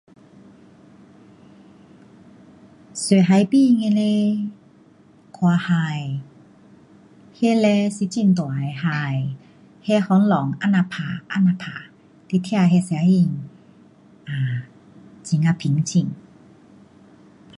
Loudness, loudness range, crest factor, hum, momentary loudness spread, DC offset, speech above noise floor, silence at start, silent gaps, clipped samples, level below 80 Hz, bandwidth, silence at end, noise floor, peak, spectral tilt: -20 LUFS; 5 LU; 18 dB; none; 16 LU; under 0.1%; 33 dB; 2.95 s; none; under 0.1%; -64 dBFS; 11 kHz; 1.4 s; -51 dBFS; -4 dBFS; -6.5 dB/octave